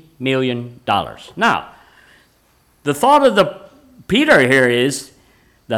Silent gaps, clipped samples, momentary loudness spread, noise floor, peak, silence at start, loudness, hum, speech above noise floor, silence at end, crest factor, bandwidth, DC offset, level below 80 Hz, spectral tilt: none; under 0.1%; 12 LU; -56 dBFS; -2 dBFS; 0.2 s; -15 LUFS; none; 41 dB; 0 s; 14 dB; 18.5 kHz; under 0.1%; -52 dBFS; -4.5 dB/octave